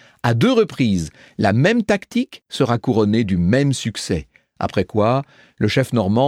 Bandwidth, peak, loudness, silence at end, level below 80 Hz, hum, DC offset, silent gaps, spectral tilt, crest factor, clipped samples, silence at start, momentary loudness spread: 14.5 kHz; -2 dBFS; -19 LUFS; 0 s; -46 dBFS; none; under 0.1%; none; -6.5 dB/octave; 16 dB; under 0.1%; 0.25 s; 8 LU